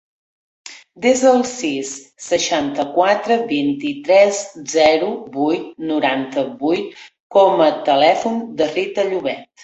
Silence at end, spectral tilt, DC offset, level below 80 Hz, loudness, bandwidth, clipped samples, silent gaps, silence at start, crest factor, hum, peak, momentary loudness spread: 0.2 s; -3.5 dB/octave; under 0.1%; -60 dBFS; -17 LUFS; 8.2 kHz; under 0.1%; 7.20-7.30 s; 0.65 s; 16 dB; none; -2 dBFS; 11 LU